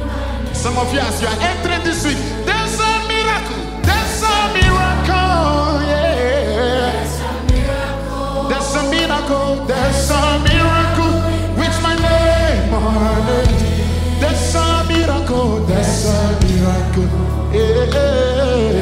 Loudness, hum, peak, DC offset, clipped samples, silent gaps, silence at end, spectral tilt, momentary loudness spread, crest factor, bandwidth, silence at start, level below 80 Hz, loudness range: -16 LUFS; none; 0 dBFS; under 0.1%; under 0.1%; none; 0 s; -5 dB/octave; 5 LU; 14 dB; 16 kHz; 0 s; -22 dBFS; 3 LU